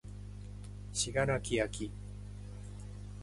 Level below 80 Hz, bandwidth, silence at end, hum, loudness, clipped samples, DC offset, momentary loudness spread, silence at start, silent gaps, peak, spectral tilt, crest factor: -48 dBFS; 11.5 kHz; 0 s; 50 Hz at -45 dBFS; -37 LUFS; under 0.1%; under 0.1%; 16 LU; 0.05 s; none; -16 dBFS; -4 dB/octave; 22 dB